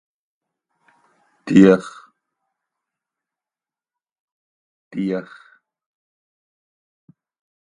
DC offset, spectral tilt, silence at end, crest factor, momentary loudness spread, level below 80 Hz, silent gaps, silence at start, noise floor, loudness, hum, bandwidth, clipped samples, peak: under 0.1%; -7.5 dB/octave; 2.55 s; 24 dB; 25 LU; -62 dBFS; 4.20-4.91 s; 1.45 s; under -90 dBFS; -16 LUFS; none; 10 kHz; under 0.1%; 0 dBFS